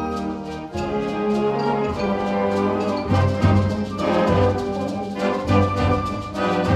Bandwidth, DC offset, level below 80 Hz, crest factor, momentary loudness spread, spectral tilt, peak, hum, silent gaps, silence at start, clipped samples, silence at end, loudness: 9.8 kHz; under 0.1%; -40 dBFS; 16 dB; 8 LU; -7.5 dB/octave; -4 dBFS; none; none; 0 s; under 0.1%; 0 s; -21 LUFS